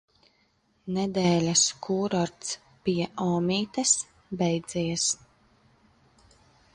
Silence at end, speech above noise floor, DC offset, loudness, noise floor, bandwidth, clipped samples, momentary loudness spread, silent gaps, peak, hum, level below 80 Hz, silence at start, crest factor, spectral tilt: 1.6 s; 42 dB; under 0.1%; -26 LUFS; -68 dBFS; 11 kHz; under 0.1%; 12 LU; none; -8 dBFS; none; -62 dBFS; 0.85 s; 20 dB; -4 dB/octave